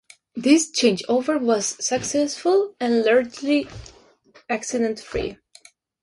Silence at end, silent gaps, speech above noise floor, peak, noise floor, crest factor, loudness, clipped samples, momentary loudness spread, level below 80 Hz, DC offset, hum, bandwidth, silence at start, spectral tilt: 0.7 s; none; 33 dB; -4 dBFS; -54 dBFS; 18 dB; -21 LUFS; under 0.1%; 11 LU; -52 dBFS; under 0.1%; none; 11.5 kHz; 0.35 s; -3 dB/octave